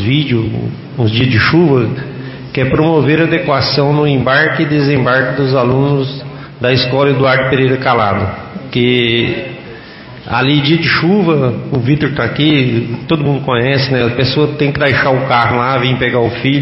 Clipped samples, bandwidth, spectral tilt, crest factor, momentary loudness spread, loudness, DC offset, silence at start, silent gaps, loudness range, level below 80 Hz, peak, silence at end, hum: under 0.1%; 5.8 kHz; -9.5 dB/octave; 12 dB; 10 LU; -12 LUFS; under 0.1%; 0 s; none; 2 LU; -40 dBFS; 0 dBFS; 0 s; none